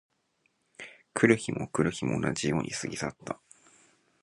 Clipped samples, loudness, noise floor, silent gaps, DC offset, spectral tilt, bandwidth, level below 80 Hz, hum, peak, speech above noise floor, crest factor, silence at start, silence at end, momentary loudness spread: under 0.1%; -29 LUFS; -74 dBFS; none; under 0.1%; -5 dB/octave; 11.5 kHz; -60 dBFS; none; -6 dBFS; 45 dB; 24 dB; 0.8 s; 0.85 s; 18 LU